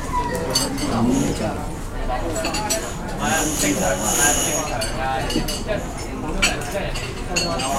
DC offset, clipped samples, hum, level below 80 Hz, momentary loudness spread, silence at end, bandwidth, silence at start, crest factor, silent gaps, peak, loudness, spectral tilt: under 0.1%; under 0.1%; none; -30 dBFS; 10 LU; 0 s; 16.5 kHz; 0 s; 18 dB; none; -4 dBFS; -22 LUFS; -3 dB/octave